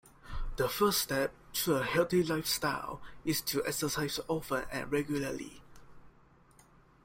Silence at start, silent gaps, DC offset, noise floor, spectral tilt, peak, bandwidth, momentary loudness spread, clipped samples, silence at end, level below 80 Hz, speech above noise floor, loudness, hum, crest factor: 0.05 s; none; under 0.1%; -62 dBFS; -4 dB/octave; -16 dBFS; 16.5 kHz; 13 LU; under 0.1%; 0.95 s; -50 dBFS; 29 dB; -32 LUFS; none; 18 dB